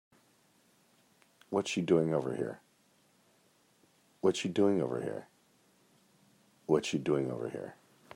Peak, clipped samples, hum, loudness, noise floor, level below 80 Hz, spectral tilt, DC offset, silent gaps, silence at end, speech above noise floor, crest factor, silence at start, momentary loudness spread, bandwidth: -14 dBFS; under 0.1%; none; -33 LUFS; -69 dBFS; -76 dBFS; -6 dB/octave; under 0.1%; none; 0.4 s; 37 dB; 22 dB; 1.5 s; 15 LU; 12 kHz